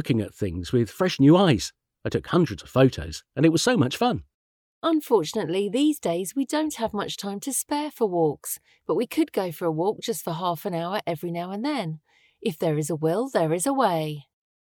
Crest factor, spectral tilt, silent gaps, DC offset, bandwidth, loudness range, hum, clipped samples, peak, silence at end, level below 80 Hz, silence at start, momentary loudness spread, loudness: 18 dB; -5.5 dB/octave; 4.34-4.82 s; under 0.1%; over 20 kHz; 6 LU; none; under 0.1%; -6 dBFS; 0.4 s; -56 dBFS; 0 s; 10 LU; -25 LUFS